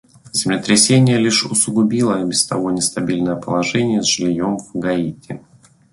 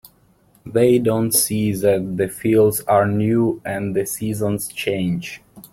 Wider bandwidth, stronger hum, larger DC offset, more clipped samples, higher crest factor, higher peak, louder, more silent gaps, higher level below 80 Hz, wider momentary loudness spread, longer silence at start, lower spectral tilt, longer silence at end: second, 12 kHz vs 16.5 kHz; neither; neither; neither; about the same, 18 dB vs 16 dB; about the same, 0 dBFS vs -2 dBFS; first, -16 LUFS vs -19 LUFS; neither; about the same, -52 dBFS vs -52 dBFS; about the same, 10 LU vs 8 LU; second, 0.25 s vs 0.65 s; about the same, -4 dB/octave vs -5 dB/octave; first, 0.55 s vs 0.05 s